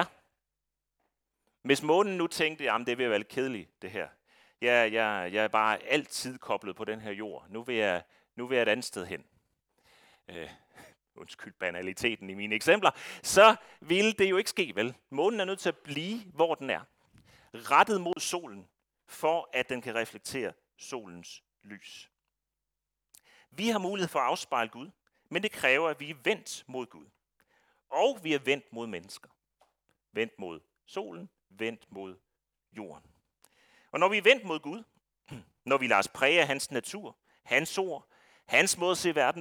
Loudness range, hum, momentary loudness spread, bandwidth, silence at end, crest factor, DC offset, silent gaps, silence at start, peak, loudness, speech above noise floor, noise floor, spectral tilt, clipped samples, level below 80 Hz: 14 LU; none; 21 LU; 19 kHz; 0 s; 26 dB; under 0.1%; none; 0 s; -6 dBFS; -29 LUFS; 58 dB; -88 dBFS; -3 dB/octave; under 0.1%; -72 dBFS